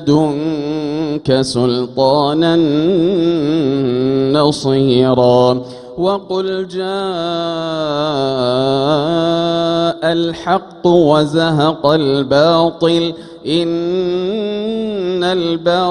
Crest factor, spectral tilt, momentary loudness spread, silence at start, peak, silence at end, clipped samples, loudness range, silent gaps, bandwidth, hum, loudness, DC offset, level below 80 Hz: 14 dB; -6.5 dB/octave; 7 LU; 0 s; 0 dBFS; 0 s; under 0.1%; 3 LU; none; 10.5 kHz; none; -15 LUFS; under 0.1%; -48 dBFS